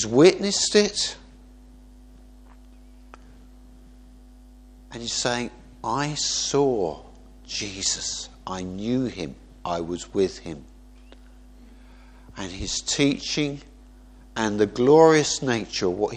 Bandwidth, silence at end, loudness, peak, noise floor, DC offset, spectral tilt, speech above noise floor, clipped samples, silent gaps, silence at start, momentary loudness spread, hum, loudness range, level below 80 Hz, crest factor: 10 kHz; 0 s; -23 LUFS; -2 dBFS; -48 dBFS; under 0.1%; -3.5 dB/octave; 25 dB; under 0.1%; none; 0 s; 19 LU; none; 11 LU; -48 dBFS; 24 dB